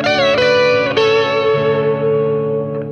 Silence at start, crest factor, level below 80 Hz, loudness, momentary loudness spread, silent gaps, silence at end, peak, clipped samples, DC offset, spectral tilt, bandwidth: 0 s; 12 dB; -52 dBFS; -14 LUFS; 6 LU; none; 0 s; -2 dBFS; under 0.1%; under 0.1%; -5.5 dB/octave; 7 kHz